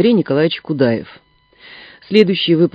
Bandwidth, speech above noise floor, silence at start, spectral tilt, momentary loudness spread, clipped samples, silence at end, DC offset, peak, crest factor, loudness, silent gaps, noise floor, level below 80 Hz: 8 kHz; 30 dB; 0 s; -8 dB/octave; 7 LU; under 0.1%; 0.05 s; under 0.1%; 0 dBFS; 16 dB; -15 LUFS; none; -44 dBFS; -58 dBFS